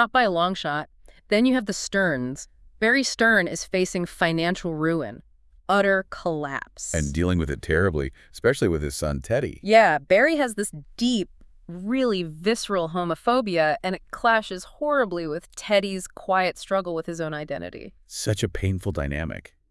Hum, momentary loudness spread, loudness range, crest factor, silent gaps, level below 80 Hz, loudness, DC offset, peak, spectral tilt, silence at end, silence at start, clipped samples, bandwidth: none; 14 LU; 5 LU; 22 dB; none; -44 dBFS; -24 LUFS; under 0.1%; -2 dBFS; -4.5 dB/octave; 0.3 s; 0 s; under 0.1%; 12 kHz